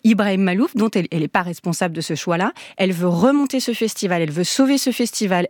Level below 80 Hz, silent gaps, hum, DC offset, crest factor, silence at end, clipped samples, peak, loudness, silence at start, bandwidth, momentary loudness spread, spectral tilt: -66 dBFS; none; none; under 0.1%; 18 dB; 0 s; under 0.1%; -2 dBFS; -19 LUFS; 0.05 s; 19 kHz; 6 LU; -5 dB/octave